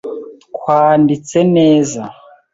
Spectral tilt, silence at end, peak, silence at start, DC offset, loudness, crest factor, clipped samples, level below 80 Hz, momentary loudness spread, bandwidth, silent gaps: -6.5 dB/octave; 0.4 s; 0 dBFS; 0.05 s; under 0.1%; -12 LUFS; 12 dB; under 0.1%; -56 dBFS; 19 LU; 7.8 kHz; none